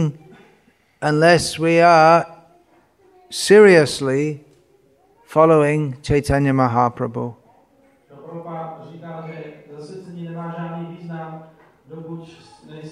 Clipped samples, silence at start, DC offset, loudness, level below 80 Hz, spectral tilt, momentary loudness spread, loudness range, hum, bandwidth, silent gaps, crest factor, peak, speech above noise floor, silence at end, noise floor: under 0.1%; 0 s; under 0.1%; -16 LUFS; -46 dBFS; -5.5 dB/octave; 25 LU; 19 LU; none; 13 kHz; none; 18 dB; 0 dBFS; 41 dB; 0 s; -57 dBFS